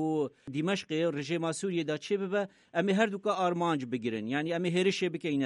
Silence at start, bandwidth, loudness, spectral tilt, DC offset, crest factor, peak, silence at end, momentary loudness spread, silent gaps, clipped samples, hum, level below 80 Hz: 0 s; 11 kHz; -31 LUFS; -5.5 dB/octave; under 0.1%; 16 dB; -14 dBFS; 0 s; 6 LU; none; under 0.1%; none; -76 dBFS